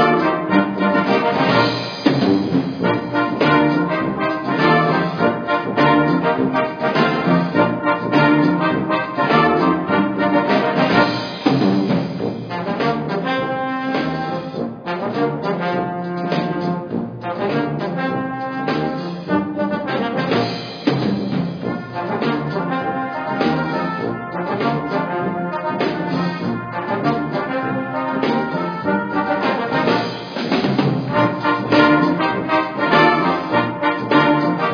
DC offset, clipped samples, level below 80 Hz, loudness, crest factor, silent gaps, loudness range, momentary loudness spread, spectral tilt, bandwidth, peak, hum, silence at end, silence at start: under 0.1%; under 0.1%; -54 dBFS; -19 LUFS; 18 dB; none; 6 LU; 9 LU; -7.5 dB/octave; 5.4 kHz; 0 dBFS; none; 0 s; 0 s